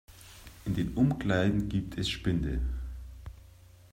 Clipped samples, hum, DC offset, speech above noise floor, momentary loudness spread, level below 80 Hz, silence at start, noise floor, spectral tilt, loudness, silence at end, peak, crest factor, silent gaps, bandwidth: under 0.1%; none; under 0.1%; 25 dB; 22 LU; -40 dBFS; 0.1 s; -54 dBFS; -6.5 dB/octave; -31 LUFS; 0.4 s; -12 dBFS; 18 dB; none; 16 kHz